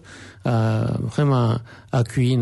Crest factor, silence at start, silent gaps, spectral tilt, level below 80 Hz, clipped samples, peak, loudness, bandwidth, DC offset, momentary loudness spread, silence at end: 14 dB; 0.05 s; none; -7.5 dB/octave; -48 dBFS; under 0.1%; -8 dBFS; -22 LUFS; 11.5 kHz; under 0.1%; 9 LU; 0 s